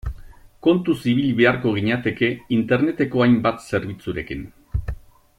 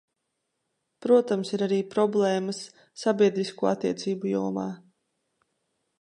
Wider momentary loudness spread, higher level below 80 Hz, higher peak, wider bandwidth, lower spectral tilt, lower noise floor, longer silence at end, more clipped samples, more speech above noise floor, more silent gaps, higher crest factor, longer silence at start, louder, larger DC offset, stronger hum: about the same, 14 LU vs 13 LU; first, -38 dBFS vs -76 dBFS; first, -4 dBFS vs -8 dBFS; first, 13.5 kHz vs 11 kHz; first, -7.5 dB/octave vs -6 dB/octave; second, -42 dBFS vs -80 dBFS; second, 0.4 s vs 1.25 s; neither; second, 22 dB vs 54 dB; neither; about the same, 16 dB vs 18 dB; second, 0.05 s vs 1 s; first, -21 LUFS vs -26 LUFS; neither; neither